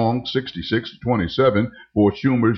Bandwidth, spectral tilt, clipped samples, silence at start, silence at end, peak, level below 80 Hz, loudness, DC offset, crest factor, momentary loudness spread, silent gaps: 6.2 kHz; -8 dB/octave; under 0.1%; 0 s; 0 s; -6 dBFS; -48 dBFS; -21 LUFS; under 0.1%; 14 dB; 7 LU; none